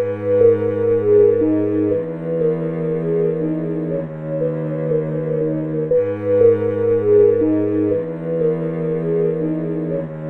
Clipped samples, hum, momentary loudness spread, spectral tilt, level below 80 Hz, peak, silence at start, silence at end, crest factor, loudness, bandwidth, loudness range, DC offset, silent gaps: under 0.1%; none; 9 LU; -11.5 dB/octave; -52 dBFS; -2 dBFS; 0 s; 0 s; 16 dB; -18 LUFS; 3.6 kHz; 4 LU; under 0.1%; none